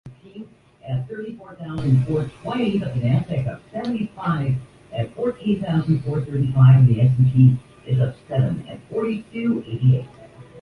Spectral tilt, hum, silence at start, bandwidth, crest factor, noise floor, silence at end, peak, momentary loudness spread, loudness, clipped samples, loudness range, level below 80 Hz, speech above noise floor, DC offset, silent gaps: -9.5 dB/octave; none; 0.05 s; 4.7 kHz; 16 dB; -41 dBFS; 0 s; -4 dBFS; 17 LU; -21 LUFS; under 0.1%; 7 LU; -48 dBFS; 22 dB; under 0.1%; none